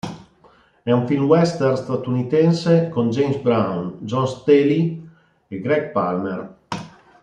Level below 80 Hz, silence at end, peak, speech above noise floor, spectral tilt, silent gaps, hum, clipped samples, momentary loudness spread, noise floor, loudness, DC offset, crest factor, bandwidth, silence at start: -60 dBFS; 0.35 s; -2 dBFS; 35 dB; -7.5 dB/octave; none; none; under 0.1%; 16 LU; -54 dBFS; -19 LUFS; under 0.1%; 18 dB; 9.6 kHz; 0.05 s